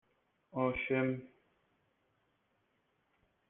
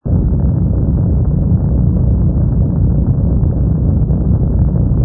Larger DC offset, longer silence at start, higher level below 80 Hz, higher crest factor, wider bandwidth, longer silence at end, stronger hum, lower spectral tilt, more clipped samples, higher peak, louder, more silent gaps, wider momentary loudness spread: neither; first, 0.55 s vs 0.05 s; second, -66 dBFS vs -16 dBFS; first, 22 dB vs 10 dB; first, 3.9 kHz vs 1.7 kHz; first, 2.2 s vs 0 s; neither; second, -6 dB/octave vs -16.5 dB/octave; neither; second, -20 dBFS vs -2 dBFS; second, -36 LUFS vs -14 LUFS; neither; first, 11 LU vs 1 LU